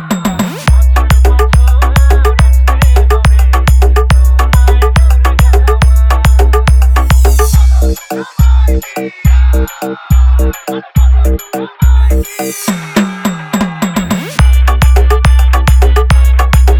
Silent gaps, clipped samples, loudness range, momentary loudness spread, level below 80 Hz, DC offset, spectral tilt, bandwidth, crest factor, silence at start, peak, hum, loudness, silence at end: none; 0.4%; 4 LU; 7 LU; -8 dBFS; under 0.1%; -6 dB/octave; 15.5 kHz; 6 dB; 0 s; 0 dBFS; none; -10 LUFS; 0 s